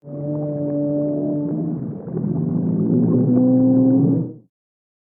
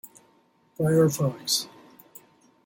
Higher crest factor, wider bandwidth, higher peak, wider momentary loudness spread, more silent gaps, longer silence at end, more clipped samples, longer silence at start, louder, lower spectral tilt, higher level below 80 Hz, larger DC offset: about the same, 14 dB vs 18 dB; second, 1.7 kHz vs 17 kHz; first, -6 dBFS vs -10 dBFS; first, 11 LU vs 7 LU; neither; second, 0.65 s vs 1 s; neither; about the same, 0.05 s vs 0.05 s; first, -19 LUFS vs -24 LUFS; first, -16.5 dB/octave vs -5 dB/octave; about the same, -60 dBFS vs -64 dBFS; neither